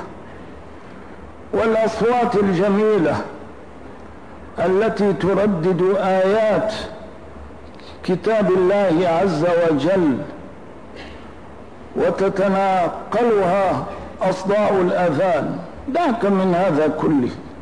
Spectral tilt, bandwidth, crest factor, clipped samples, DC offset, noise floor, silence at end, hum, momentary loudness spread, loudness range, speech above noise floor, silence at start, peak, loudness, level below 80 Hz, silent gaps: -7 dB/octave; 10.5 kHz; 10 dB; under 0.1%; 0.8%; -39 dBFS; 0 s; none; 22 LU; 2 LU; 22 dB; 0 s; -8 dBFS; -18 LUFS; -48 dBFS; none